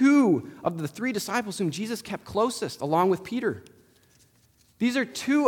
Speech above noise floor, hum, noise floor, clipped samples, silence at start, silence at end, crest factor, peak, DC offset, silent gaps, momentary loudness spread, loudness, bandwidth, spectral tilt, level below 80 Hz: 35 dB; none; -62 dBFS; under 0.1%; 0 s; 0 s; 18 dB; -8 dBFS; under 0.1%; none; 8 LU; -27 LUFS; 18.5 kHz; -5 dB/octave; -66 dBFS